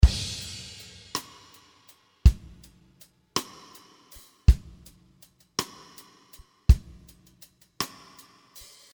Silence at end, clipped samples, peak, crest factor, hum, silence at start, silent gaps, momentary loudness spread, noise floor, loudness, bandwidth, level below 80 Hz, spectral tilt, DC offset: 1.05 s; under 0.1%; -4 dBFS; 24 dB; none; 0 s; none; 27 LU; -59 dBFS; -28 LUFS; over 20 kHz; -28 dBFS; -4.5 dB/octave; under 0.1%